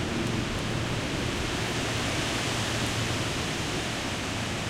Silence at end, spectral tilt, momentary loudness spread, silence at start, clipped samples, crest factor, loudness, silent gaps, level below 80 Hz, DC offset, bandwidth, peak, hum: 0 s; -4 dB/octave; 2 LU; 0 s; under 0.1%; 14 dB; -29 LUFS; none; -42 dBFS; under 0.1%; 16 kHz; -16 dBFS; none